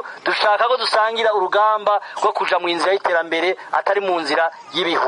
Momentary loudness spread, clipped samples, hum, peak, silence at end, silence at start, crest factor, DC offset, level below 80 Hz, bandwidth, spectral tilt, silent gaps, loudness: 4 LU; under 0.1%; none; -4 dBFS; 0 s; 0 s; 16 dB; under 0.1%; -74 dBFS; 11 kHz; -2.5 dB/octave; none; -18 LUFS